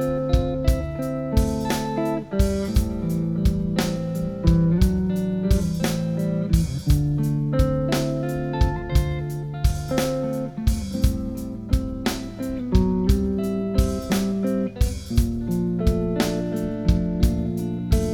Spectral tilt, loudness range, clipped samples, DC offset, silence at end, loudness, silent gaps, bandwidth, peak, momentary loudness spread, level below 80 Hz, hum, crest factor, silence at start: -7 dB/octave; 3 LU; under 0.1%; under 0.1%; 0 s; -24 LUFS; none; 18 kHz; -4 dBFS; 5 LU; -26 dBFS; none; 18 dB; 0 s